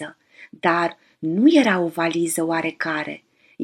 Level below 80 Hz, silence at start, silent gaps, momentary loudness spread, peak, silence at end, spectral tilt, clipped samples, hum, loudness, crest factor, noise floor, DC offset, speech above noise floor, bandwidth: -74 dBFS; 0 s; none; 15 LU; -2 dBFS; 0 s; -4.5 dB/octave; under 0.1%; none; -20 LUFS; 18 dB; -41 dBFS; under 0.1%; 21 dB; 13.5 kHz